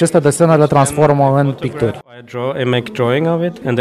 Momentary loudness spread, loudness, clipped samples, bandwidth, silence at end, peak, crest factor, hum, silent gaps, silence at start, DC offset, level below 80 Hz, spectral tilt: 10 LU; -14 LUFS; under 0.1%; 13.5 kHz; 0 s; -2 dBFS; 12 dB; none; none; 0 s; under 0.1%; -48 dBFS; -6 dB/octave